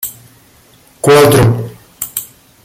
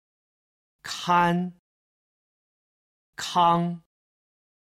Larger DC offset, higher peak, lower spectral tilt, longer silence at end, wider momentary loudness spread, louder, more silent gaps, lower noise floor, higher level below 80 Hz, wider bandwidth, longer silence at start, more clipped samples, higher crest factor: neither; first, 0 dBFS vs -8 dBFS; about the same, -5 dB/octave vs -5 dB/octave; second, 0.4 s vs 0.85 s; about the same, 18 LU vs 19 LU; first, -11 LUFS vs -24 LUFS; second, none vs 1.59-3.13 s; second, -46 dBFS vs under -90 dBFS; first, -38 dBFS vs -68 dBFS; first, 17 kHz vs 14.5 kHz; second, 0 s vs 0.85 s; neither; second, 14 dB vs 20 dB